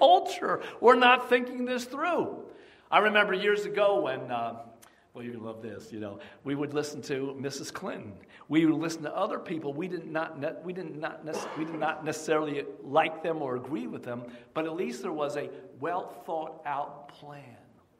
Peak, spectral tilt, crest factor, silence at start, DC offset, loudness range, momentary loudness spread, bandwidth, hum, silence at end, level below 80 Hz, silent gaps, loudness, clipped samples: -6 dBFS; -4.5 dB/octave; 24 dB; 0 s; under 0.1%; 11 LU; 17 LU; 15.5 kHz; none; 0.45 s; -76 dBFS; none; -29 LUFS; under 0.1%